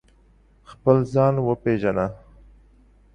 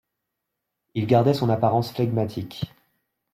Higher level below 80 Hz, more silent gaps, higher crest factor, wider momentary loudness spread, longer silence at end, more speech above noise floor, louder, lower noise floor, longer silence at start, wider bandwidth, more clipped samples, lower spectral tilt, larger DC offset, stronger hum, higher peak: first, -50 dBFS vs -60 dBFS; neither; about the same, 20 dB vs 18 dB; second, 7 LU vs 14 LU; first, 1 s vs 0.65 s; second, 35 dB vs 60 dB; about the same, -22 LUFS vs -23 LUFS; second, -56 dBFS vs -82 dBFS; second, 0.7 s vs 0.95 s; second, 9.2 kHz vs 15 kHz; neither; first, -9.5 dB/octave vs -8 dB/octave; neither; neither; about the same, -4 dBFS vs -6 dBFS